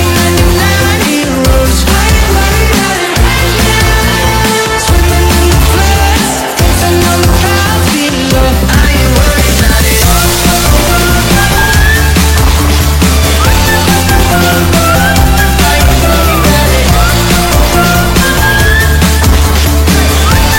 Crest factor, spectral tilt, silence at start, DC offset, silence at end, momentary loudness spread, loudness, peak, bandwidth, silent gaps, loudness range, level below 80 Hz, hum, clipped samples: 6 dB; -4 dB/octave; 0 s; under 0.1%; 0 s; 2 LU; -7 LUFS; 0 dBFS; 17 kHz; none; 1 LU; -12 dBFS; none; 0.8%